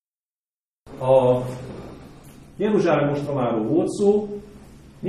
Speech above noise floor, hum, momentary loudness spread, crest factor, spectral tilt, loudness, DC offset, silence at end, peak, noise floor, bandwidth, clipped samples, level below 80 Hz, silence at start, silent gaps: over 70 dB; none; 19 LU; 18 dB; -7.5 dB/octave; -21 LUFS; under 0.1%; 0 s; -6 dBFS; under -90 dBFS; 12.5 kHz; under 0.1%; -52 dBFS; 0.85 s; none